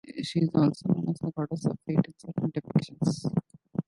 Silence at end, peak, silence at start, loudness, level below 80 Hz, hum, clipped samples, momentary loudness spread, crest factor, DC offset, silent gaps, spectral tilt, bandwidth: 0.05 s; -10 dBFS; 0.05 s; -29 LUFS; -62 dBFS; none; under 0.1%; 8 LU; 18 dB; under 0.1%; none; -7.5 dB/octave; 11.5 kHz